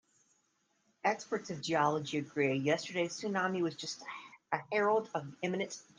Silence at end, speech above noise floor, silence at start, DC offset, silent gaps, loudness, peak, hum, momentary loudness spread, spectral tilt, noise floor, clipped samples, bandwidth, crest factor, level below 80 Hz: 0.15 s; 42 dB; 1.05 s; under 0.1%; none; -34 LUFS; -16 dBFS; none; 10 LU; -4.5 dB/octave; -77 dBFS; under 0.1%; 10 kHz; 20 dB; -80 dBFS